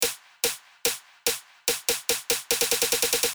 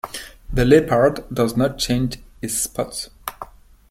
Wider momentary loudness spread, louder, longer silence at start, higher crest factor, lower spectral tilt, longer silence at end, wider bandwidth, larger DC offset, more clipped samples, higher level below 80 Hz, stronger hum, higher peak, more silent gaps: second, 6 LU vs 18 LU; second, -25 LUFS vs -20 LUFS; about the same, 0 s vs 0.05 s; about the same, 22 dB vs 20 dB; second, 0.5 dB/octave vs -5 dB/octave; second, 0 s vs 0.45 s; first, over 20 kHz vs 16.5 kHz; neither; neither; second, -58 dBFS vs -36 dBFS; neither; second, -6 dBFS vs -2 dBFS; neither